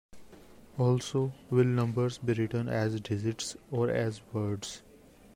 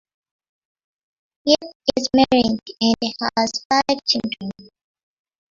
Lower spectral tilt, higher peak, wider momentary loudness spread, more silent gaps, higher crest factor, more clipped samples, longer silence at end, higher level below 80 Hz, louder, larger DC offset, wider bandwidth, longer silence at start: first, -6.5 dB/octave vs -3.5 dB/octave; second, -14 dBFS vs -2 dBFS; about the same, 9 LU vs 10 LU; second, none vs 1.75-1.80 s, 3.65-3.70 s; about the same, 18 dB vs 20 dB; neither; second, 0.55 s vs 0.9 s; second, -62 dBFS vs -52 dBFS; second, -31 LUFS vs -19 LUFS; neither; first, 13 kHz vs 7.6 kHz; second, 0.15 s vs 1.45 s